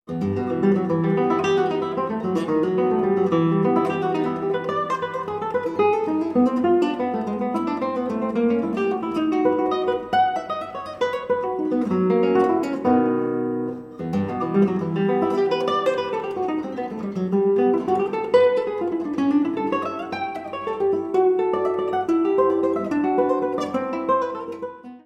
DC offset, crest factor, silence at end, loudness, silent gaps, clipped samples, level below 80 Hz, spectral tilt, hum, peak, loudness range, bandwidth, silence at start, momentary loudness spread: under 0.1%; 16 dB; 0.05 s; -22 LUFS; none; under 0.1%; -62 dBFS; -7.5 dB/octave; none; -6 dBFS; 2 LU; 9 kHz; 0.1 s; 8 LU